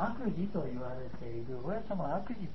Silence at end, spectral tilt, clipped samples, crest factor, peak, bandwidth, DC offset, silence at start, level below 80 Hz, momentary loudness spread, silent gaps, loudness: 0 s; -7.5 dB/octave; under 0.1%; 16 dB; -22 dBFS; 6 kHz; 1%; 0 s; -54 dBFS; 8 LU; none; -38 LUFS